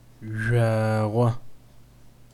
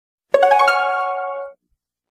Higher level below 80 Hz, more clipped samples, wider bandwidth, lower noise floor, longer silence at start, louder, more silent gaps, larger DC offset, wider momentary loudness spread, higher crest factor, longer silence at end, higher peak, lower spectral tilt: first, -52 dBFS vs -70 dBFS; neither; second, 12 kHz vs 15.5 kHz; second, -51 dBFS vs -72 dBFS; second, 0.2 s vs 0.35 s; second, -24 LUFS vs -17 LUFS; neither; neither; second, 12 LU vs 16 LU; about the same, 16 dB vs 18 dB; second, 0.25 s vs 0.6 s; second, -10 dBFS vs 0 dBFS; first, -8 dB/octave vs -1 dB/octave